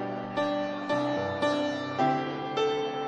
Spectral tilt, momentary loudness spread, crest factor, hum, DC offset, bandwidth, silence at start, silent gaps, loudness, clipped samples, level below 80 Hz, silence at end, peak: -5.5 dB/octave; 4 LU; 14 dB; none; under 0.1%; 9.6 kHz; 0 s; none; -29 LUFS; under 0.1%; -70 dBFS; 0 s; -14 dBFS